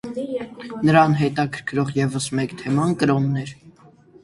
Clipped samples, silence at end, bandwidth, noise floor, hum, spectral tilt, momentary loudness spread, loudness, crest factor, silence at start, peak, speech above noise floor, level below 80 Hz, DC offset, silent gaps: under 0.1%; 0.55 s; 11.5 kHz; -50 dBFS; none; -6.5 dB/octave; 13 LU; -21 LUFS; 20 dB; 0.05 s; 0 dBFS; 30 dB; -56 dBFS; under 0.1%; none